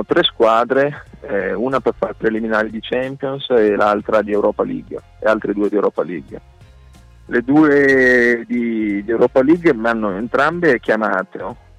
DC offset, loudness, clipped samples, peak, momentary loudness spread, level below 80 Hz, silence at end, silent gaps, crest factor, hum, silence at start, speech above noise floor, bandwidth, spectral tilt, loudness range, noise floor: under 0.1%; -16 LUFS; under 0.1%; -4 dBFS; 12 LU; -46 dBFS; 0.25 s; none; 12 dB; none; 0 s; 27 dB; 10.5 kHz; -6.5 dB/octave; 5 LU; -43 dBFS